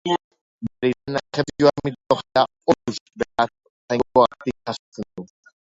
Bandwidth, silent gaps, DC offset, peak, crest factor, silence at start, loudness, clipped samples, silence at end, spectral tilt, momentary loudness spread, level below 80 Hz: 7.8 kHz; 0.24-0.31 s, 0.41-0.59 s, 3.01-3.06 s, 3.70-3.88 s, 4.79-4.92 s; under 0.1%; -4 dBFS; 20 dB; 0.05 s; -22 LUFS; under 0.1%; 0.4 s; -5.5 dB/octave; 16 LU; -54 dBFS